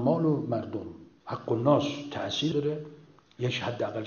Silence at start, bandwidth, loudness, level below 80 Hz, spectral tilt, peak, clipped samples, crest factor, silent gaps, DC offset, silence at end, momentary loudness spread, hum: 0 s; 7 kHz; -30 LUFS; -62 dBFS; -6.5 dB/octave; -10 dBFS; under 0.1%; 20 dB; none; under 0.1%; 0 s; 14 LU; none